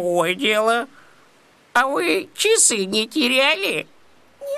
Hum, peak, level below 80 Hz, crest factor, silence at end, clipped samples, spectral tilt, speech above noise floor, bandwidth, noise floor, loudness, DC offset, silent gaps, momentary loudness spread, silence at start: none; -4 dBFS; -70 dBFS; 18 dB; 0 s; under 0.1%; -1.5 dB/octave; 35 dB; 15 kHz; -54 dBFS; -18 LUFS; under 0.1%; none; 9 LU; 0 s